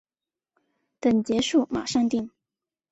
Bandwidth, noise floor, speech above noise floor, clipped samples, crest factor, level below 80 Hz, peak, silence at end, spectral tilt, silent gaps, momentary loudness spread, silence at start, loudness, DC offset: 8.2 kHz; under -90 dBFS; over 67 dB; under 0.1%; 16 dB; -60 dBFS; -10 dBFS; 0.65 s; -4.5 dB/octave; none; 6 LU; 1.05 s; -24 LUFS; under 0.1%